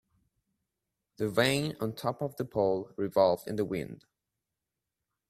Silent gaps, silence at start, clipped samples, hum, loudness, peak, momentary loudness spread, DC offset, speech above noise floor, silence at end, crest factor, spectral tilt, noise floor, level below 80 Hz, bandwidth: none; 1.2 s; under 0.1%; none; -30 LUFS; -12 dBFS; 9 LU; under 0.1%; 58 dB; 1.35 s; 22 dB; -5.5 dB/octave; -88 dBFS; -66 dBFS; 15 kHz